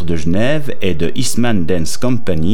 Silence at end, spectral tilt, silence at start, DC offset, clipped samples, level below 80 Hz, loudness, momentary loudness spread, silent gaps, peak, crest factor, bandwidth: 0 s; -5.5 dB/octave; 0 s; 30%; under 0.1%; -36 dBFS; -17 LUFS; 3 LU; none; 0 dBFS; 14 dB; 18.5 kHz